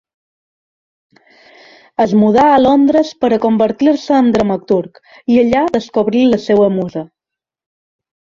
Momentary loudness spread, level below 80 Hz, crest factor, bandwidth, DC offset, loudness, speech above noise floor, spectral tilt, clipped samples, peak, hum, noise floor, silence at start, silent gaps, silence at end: 10 LU; -48 dBFS; 14 dB; 7.4 kHz; under 0.1%; -13 LUFS; 73 dB; -7 dB/octave; under 0.1%; 0 dBFS; none; -85 dBFS; 2 s; none; 1.3 s